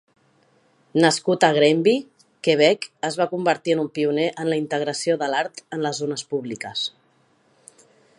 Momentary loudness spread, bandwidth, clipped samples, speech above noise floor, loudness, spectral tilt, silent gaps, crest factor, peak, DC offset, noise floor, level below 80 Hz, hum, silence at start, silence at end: 11 LU; 11.5 kHz; under 0.1%; 40 dB; -22 LUFS; -4.5 dB/octave; none; 22 dB; -2 dBFS; under 0.1%; -61 dBFS; -74 dBFS; none; 0.95 s; 1.3 s